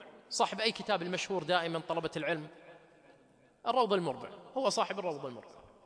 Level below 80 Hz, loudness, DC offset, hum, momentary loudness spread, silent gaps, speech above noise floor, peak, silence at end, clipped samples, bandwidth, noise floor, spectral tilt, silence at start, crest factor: -74 dBFS; -34 LUFS; under 0.1%; none; 11 LU; none; 31 dB; -14 dBFS; 0.2 s; under 0.1%; 10.5 kHz; -65 dBFS; -3.5 dB/octave; 0 s; 20 dB